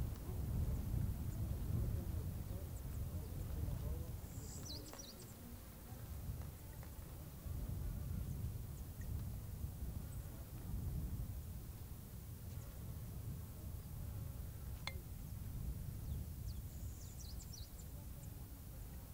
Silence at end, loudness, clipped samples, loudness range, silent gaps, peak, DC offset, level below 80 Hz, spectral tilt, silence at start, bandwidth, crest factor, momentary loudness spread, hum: 0 s; -48 LUFS; under 0.1%; 6 LU; none; -24 dBFS; under 0.1%; -50 dBFS; -6 dB/octave; 0 s; 16 kHz; 22 dB; 10 LU; none